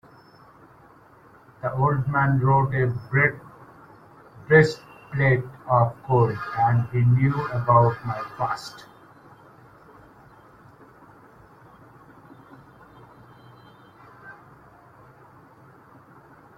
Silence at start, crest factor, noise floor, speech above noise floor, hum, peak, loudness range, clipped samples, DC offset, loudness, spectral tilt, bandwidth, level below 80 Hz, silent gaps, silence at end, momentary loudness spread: 1.65 s; 22 dB; -52 dBFS; 31 dB; none; -2 dBFS; 5 LU; under 0.1%; under 0.1%; -22 LUFS; -8 dB/octave; 7.8 kHz; -54 dBFS; none; 2.25 s; 15 LU